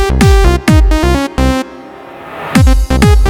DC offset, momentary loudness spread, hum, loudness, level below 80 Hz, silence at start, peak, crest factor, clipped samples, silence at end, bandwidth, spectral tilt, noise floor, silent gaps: under 0.1%; 19 LU; none; -10 LUFS; -12 dBFS; 0 s; 0 dBFS; 8 dB; 1%; 0 s; 16 kHz; -6 dB/octave; -30 dBFS; none